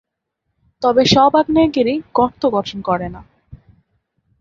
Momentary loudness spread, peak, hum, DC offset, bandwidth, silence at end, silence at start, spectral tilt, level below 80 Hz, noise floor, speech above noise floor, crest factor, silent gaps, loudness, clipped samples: 10 LU; 0 dBFS; none; under 0.1%; 7.6 kHz; 0.85 s; 0.8 s; -5.5 dB/octave; -46 dBFS; -75 dBFS; 60 dB; 16 dB; none; -15 LUFS; under 0.1%